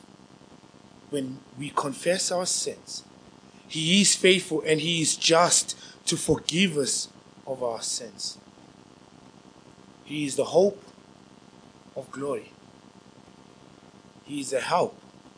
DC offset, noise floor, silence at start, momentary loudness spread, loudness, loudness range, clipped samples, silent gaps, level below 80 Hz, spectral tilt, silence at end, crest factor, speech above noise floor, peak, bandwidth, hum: under 0.1%; -52 dBFS; 1.1 s; 18 LU; -25 LUFS; 13 LU; under 0.1%; none; -62 dBFS; -3 dB/octave; 0.1 s; 26 dB; 27 dB; -2 dBFS; 10.5 kHz; none